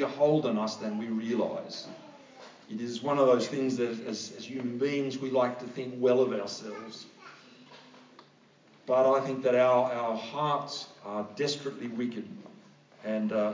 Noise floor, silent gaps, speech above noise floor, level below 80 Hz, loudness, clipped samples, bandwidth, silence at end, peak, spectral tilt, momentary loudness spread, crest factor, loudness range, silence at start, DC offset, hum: -60 dBFS; none; 31 dB; -84 dBFS; -30 LUFS; under 0.1%; 7.6 kHz; 0 s; -12 dBFS; -5.5 dB/octave; 20 LU; 18 dB; 5 LU; 0 s; under 0.1%; none